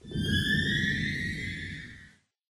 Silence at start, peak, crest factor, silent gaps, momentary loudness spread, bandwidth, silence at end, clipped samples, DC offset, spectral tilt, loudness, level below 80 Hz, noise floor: 0.05 s; -14 dBFS; 16 dB; none; 14 LU; 14 kHz; 0.45 s; under 0.1%; under 0.1%; -4.5 dB/octave; -29 LUFS; -48 dBFS; -57 dBFS